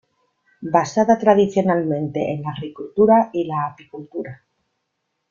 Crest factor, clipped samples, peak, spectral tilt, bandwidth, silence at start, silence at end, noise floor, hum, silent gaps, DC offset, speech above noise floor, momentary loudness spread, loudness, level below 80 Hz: 18 dB; under 0.1%; -2 dBFS; -7 dB/octave; 7.4 kHz; 0.6 s; 0.95 s; -75 dBFS; none; none; under 0.1%; 56 dB; 17 LU; -19 LUFS; -60 dBFS